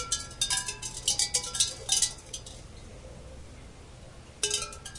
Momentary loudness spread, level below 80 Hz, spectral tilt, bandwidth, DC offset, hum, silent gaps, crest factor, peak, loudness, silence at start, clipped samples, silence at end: 24 LU; -50 dBFS; 0 dB/octave; 11.5 kHz; under 0.1%; none; none; 22 dB; -10 dBFS; -28 LUFS; 0 s; under 0.1%; 0 s